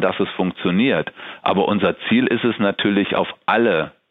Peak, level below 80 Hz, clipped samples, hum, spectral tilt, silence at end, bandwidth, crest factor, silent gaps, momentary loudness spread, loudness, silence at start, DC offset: -4 dBFS; -58 dBFS; under 0.1%; none; -9 dB/octave; 0.2 s; 4.2 kHz; 16 dB; none; 5 LU; -19 LUFS; 0 s; under 0.1%